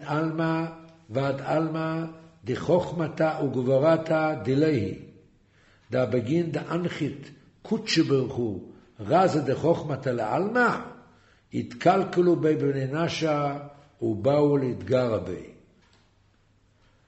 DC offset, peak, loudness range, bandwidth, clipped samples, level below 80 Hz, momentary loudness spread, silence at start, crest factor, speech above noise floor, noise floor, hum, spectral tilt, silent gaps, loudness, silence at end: under 0.1%; -8 dBFS; 3 LU; 8.2 kHz; under 0.1%; -60 dBFS; 12 LU; 0 s; 18 dB; 38 dB; -63 dBFS; none; -7 dB/octave; none; -26 LUFS; 1.55 s